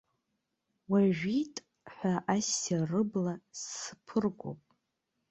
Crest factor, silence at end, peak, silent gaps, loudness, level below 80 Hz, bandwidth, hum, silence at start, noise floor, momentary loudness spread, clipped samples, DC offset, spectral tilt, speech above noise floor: 20 dB; 0.75 s; -14 dBFS; none; -32 LUFS; -72 dBFS; 8.2 kHz; none; 0.9 s; -83 dBFS; 13 LU; under 0.1%; under 0.1%; -5 dB/octave; 51 dB